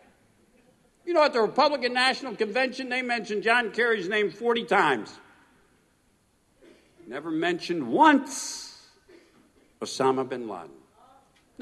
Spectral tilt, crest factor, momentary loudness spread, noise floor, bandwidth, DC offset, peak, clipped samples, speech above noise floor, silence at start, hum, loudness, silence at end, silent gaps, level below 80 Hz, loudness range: -3.5 dB/octave; 22 dB; 17 LU; -66 dBFS; 12.5 kHz; under 0.1%; -6 dBFS; under 0.1%; 41 dB; 1.05 s; none; -25 LUFS; 0.9 s; none; -72 dBFS; 6 LU